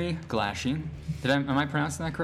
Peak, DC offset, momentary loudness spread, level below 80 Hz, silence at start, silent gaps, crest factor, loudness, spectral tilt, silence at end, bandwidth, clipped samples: -14 dBFS; under 0.1%; 7 LU; -50 dBFS; 0 s; none; 16 dB; -29 LUFS; -5.5 dB/octave; 0 s; 14.5 kHz; under 0.1%